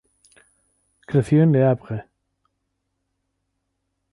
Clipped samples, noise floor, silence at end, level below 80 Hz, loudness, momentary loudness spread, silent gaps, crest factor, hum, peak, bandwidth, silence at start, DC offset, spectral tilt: under 0.1%; -76 dBFS; 2.1 s; -58 dBFS; -19 LUFS; 16 LU; none; 18 dB; none; -6 dBFS; 11.5 kHz; 1.1 s; under 0.1%; -9.5 dB/octave